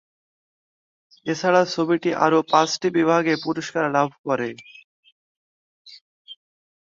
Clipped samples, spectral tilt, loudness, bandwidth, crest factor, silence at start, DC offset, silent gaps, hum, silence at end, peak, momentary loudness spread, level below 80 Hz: under 0.1%; -5 dB/octave; -21 LUFS; 7.6 kHz; 22 dB; 1.25 s; under 0.1%; 4.19-4.24 s, 4.84-5.03 s, 5.12-5.85 s, 6.01-6.25 s; none; 0.55 s; -2 dBFS; 8 LU; -68 dBFS